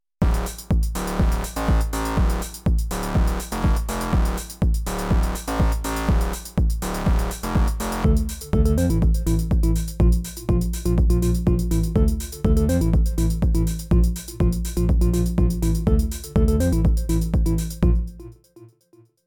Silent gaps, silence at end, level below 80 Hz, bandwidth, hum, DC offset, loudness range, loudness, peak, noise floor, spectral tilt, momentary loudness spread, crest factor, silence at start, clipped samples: none; 0.6 s; -22 dBFS; 19.5 kHz; none; under 0.1%; 2 LU; -22 LUFS; -8 dBFS; -56 dBFS; -6.5 dB/octave; 5 LU; 12 dB; 0.2 s; under 0.1%